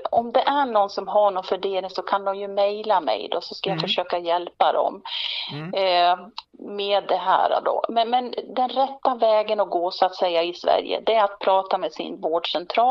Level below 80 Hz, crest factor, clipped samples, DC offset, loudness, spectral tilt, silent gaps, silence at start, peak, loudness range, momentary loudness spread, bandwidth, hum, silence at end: -68 dBFS; 18 dB; under 0.1%; under 0.1%; -23 LUFS; -5 dB/octave; none; 0 s; -4 dBFS; 2 LU; 7 LU; 7 kHz; none; 0 s